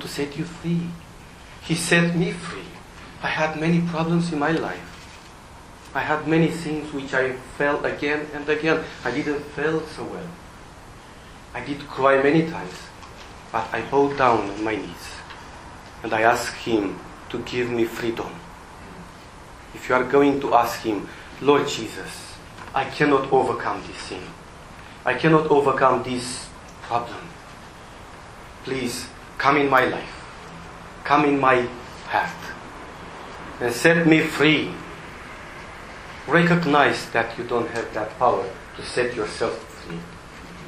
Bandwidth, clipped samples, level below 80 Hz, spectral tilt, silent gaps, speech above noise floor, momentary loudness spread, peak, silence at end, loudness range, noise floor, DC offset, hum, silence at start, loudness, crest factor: 15 kHz; under 0.1%; -50 dBFS; -5.5 dB/octave; none; 21 dB; 23 LU; 0 dBFS; 0 s; 4 LU; -43 dBFS; under 0.1%; none; 0 s; -22 LUFS; 24 dB